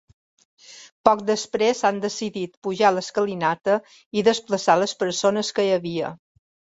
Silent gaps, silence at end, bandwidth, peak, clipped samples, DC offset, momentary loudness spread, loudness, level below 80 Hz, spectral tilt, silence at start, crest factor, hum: 0.92-1.04 s, 2.57-2.62 s, 4.06-4.11 s; 0.6 s; 8 kHz; -2 dBFS; under 0.1%; under 0.1%; 9 LU; -22 LUFS; -66 dBFS; -4 dB/octave; 0.7 s; 22 dB; none